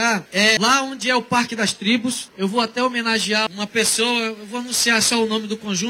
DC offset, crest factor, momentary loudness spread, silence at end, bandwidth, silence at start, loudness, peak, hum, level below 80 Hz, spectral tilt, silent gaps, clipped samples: under 0.1%; 16 dB; 8 LU; 0 s; 16.5 kHz; 0 s; -19 LUFS; -4 dBFS; none; -60 dBFS; -2 dB/octave; none; under 0.1%